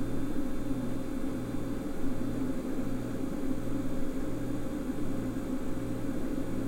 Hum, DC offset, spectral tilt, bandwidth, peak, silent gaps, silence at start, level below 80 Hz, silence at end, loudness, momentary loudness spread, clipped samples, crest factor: none; under 0.1%; -7 dB/octave; 16 kHz; -18 dBFS; none; 0 s; -40 dBFS; 0 s; -35 LUFS; 2 LU; under 0.1%; 12 dB